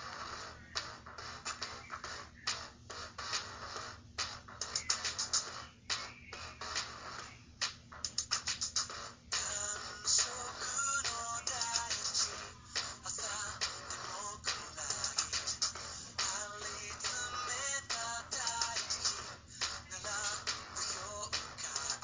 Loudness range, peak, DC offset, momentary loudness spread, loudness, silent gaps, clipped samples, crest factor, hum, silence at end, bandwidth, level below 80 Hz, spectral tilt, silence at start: 7 LU; -16 dBFS; under 0.1%; 11 LU; -37 LUFS; none; under 0.1%; 24 dB; none; 0 s; 7.8 kHz; -62 dBFS; 0 dB/octave; 0 s